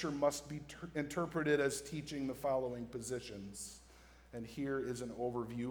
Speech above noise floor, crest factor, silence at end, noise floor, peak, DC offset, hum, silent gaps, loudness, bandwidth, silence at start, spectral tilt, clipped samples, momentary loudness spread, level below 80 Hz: 22 dB; 20 dB; 0 s; -61 dBFS; -20 dBFS; under 0.1%; none; none; -40 LUFS; over 20 kHz; 0 s; -5 dB/octave; under 0.1%; 13 LU; -64 dBFS